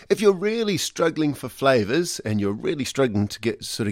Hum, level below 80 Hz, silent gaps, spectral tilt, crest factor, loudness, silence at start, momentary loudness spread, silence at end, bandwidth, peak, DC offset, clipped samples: none; -58 dBFS; none; -5 dB/octave; 18 dB; -23 LUFS; 0.1 s; 6 LU; 0 s; 16.5 kHz; -4 dBFS; under 0.1%; under 0.1%